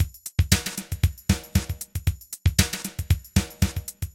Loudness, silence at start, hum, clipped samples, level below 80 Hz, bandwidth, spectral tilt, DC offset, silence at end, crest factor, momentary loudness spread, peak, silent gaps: -26 LUFS; 0 s; none; under 0.1%; -32 dBFS; 17 kHz; -4 dB/octave; under 0.1%; 0.05 s; 24 dB; 8 LU; -2 dBFS; none